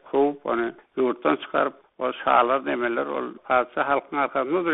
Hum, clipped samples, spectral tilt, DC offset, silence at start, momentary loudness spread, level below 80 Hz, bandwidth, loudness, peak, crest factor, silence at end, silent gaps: none; under 0.1%; -2.5 dB/octave; under 0.1%; 0.05 s; 9 LU; -64 dBFS; 4 kHz; -24 LUFS; -4 dBFS; 20 dB; 0 s; none